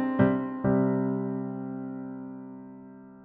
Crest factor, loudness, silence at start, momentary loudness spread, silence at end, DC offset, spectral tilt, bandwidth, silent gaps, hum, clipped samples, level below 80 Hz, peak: 20 dB; -29 LUFS; 0 s; 20 LU; 0 s; under 0.1%; -9 dB/octave; 3.7 kHz; none; none; under 0.1%; -56 dBFS; -8 dBFS